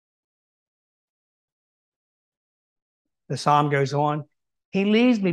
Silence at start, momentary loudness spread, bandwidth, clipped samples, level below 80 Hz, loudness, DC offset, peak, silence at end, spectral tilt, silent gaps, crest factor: 3.3 s; 12 LU; 11 kHz; under 0.1%; -74 dBFS; -22 LUFS; under 0.1%; -6 dBFS; 0 s; -6.5 dB/octave; 4.65-4.72 s; 20 dB